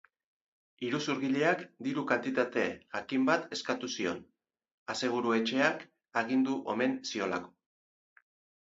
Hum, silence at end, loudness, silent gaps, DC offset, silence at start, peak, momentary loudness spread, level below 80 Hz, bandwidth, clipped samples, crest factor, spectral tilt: none; 1.15 s; -32 LUFS; 4.72-4.86 s; under 0.1%; 0.8 s; -10 dBFS; 9 LU; -74 dBFS; 8 kHz; under 0.1%; 22 dB; -4.5 dB/octave